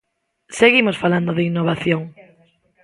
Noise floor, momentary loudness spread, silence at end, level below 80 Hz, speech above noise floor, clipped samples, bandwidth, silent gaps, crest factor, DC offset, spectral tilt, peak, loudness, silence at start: -58 dBFS; 13 LU; 0.75 s; -56 dBFS; 40 dB; under 0.1%; 11.5 kHz; none; 20 dB; under 0.1%; -5.5 dB/octave; 0 dBFS; -17 LUFS; 0.5 s